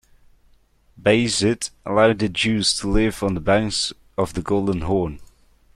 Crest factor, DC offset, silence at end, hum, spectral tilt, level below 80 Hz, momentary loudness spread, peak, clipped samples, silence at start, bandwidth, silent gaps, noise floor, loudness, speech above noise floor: 18 dB; under 0.1%; 0.5 s; none; -4.5 dB/octave; -38 dBFS; 8 LU; -4 dBFS; under 0.1%; 1 s; 13.5 kHz; none; -57 dBFS; -21 LUFS; 37 dB